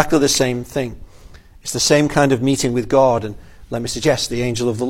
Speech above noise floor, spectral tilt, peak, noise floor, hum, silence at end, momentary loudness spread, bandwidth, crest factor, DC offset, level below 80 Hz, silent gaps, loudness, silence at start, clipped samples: 24 dB; -4 dB/octave; 0 dBFS; -41 dBFS; none; 0 s; 12 LU; 16.5 kHz; 18 dB; under 0.1%; -40 dBFS; none; -17 LUFS; 0 s; under 0.1%